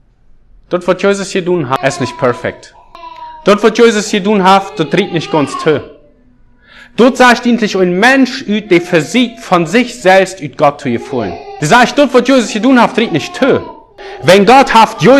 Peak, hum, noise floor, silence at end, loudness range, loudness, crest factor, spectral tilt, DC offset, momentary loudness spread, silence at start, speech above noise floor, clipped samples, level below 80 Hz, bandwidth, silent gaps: 0 dBFS; none; -45 dBFS; 0 s; 3 LU; -10 LUFS; 10 dB; -5 dB/octave; under 0.1%; 10 LU; 0.7 s; 35 dB; 2%; -46 dBFS; 16 kHz; none